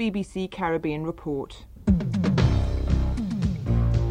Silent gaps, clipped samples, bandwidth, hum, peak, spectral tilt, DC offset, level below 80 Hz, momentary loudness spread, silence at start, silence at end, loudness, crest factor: none; under 0.1%; 9.8 kHz; none; -8 dBFS; -8 dB/octave; under 0.1%; -30 dBFS; 9 LU; 0 s; 0 s; -26 LUFS; 16 dB